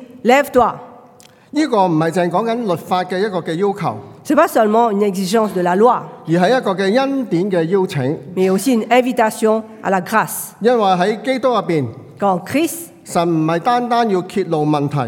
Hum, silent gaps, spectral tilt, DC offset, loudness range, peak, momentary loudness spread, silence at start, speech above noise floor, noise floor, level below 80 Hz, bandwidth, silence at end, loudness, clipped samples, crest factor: none; none; -5.5 dB/octave; under 0.1%; 2 LU; 0 dBFS; 7 LU; 0 s; 30 dB; -45 dBFS; -58 dBFS; 18 kHz; 0 s; -16 LUFS; under 0.1%; 16 dB